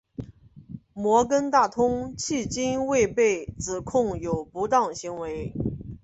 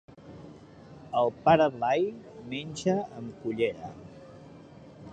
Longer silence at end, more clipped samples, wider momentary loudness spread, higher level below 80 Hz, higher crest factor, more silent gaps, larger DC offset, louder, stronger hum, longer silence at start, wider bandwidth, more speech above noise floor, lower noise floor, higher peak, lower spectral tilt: about the same, 0.05 s vs 0 s; neither; second, 16 LU vs 26 LU; first, -48 dBFS vs -62 dBFS; about the same, 18 dB vs 22 dB; neither; neither; first, -25 LUFS vs -28 LUFS; neither; about the same, 0.2 s vs 0.2 s; about the same, 8.2 kHz vs 9 kHz; about the same, 22 dB vs 22 dB; about the same, -47 dBFS vs -50 dBFS; first, -6 dBFS vs -10 dBFS; about the same, -5 dB/octave vs -6 dB/octave